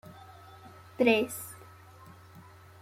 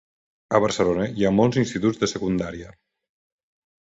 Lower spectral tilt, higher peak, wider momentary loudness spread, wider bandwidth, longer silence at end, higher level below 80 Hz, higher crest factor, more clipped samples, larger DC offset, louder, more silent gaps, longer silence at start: second, -4 dB/octave vs -6 dB/octave; second, -12 dBFS vs -4 dBFS; first, 27 LU vs 7 LU; first, 16.5 kHz vs 8 kHz; second, 0.4 s vs 1.15 s; second, -72 dBFS vs -50 dBFS; about the same, 22 dB vs 20 dB; neither; neither; second, -28 LUFS vs -22 LUFS; neither; second, 0.1 s vs 0.5 s